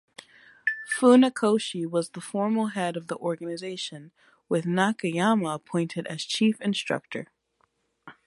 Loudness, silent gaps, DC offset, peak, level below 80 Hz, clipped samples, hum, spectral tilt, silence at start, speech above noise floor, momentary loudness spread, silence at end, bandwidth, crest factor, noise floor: -26 LUFS; none; under 0.1%; -8 dBFS; -76 dBFS; under 0.1%; none; -5 dB/octave; 0.65 s; 46 dB; 13 LU; 0.15 s; 11.5 kHz; 18 dB; -71 dBFS